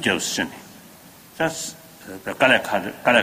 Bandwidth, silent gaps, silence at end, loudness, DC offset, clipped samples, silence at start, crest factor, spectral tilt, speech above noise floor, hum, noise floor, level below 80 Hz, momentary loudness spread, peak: 15.5 kHz; none; 0 s; -22 LUFS; under 0.1%; under 0.1%; 0 s; 22 dB; -2.5 dB/octave; 25 dB; none; -46 dBFS; -60 dBFS; 20 LU; 0 dBFS